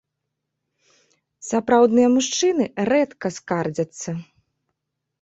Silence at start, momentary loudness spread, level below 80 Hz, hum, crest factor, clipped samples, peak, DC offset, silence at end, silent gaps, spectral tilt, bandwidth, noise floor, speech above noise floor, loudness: 1.45 s; 15 LU; -64 dBFS; none; 18 dB; under 0.1%; -4 dBFS; under 0.1%; 1 s; none; -4.5 dB/octave; 8.2 kHz; -80 dBFS; 60 dB; -20 LUFS